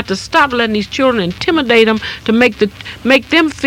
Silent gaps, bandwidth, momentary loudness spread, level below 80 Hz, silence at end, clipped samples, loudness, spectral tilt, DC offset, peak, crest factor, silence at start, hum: none; 17.5 kHz; 7 LU; -42 dBFS; 0 s; 0.4%; -13 LUFS; -4.5 dB/octave; under 0.1%; 0 dBFS; 14 dB; 0 s; none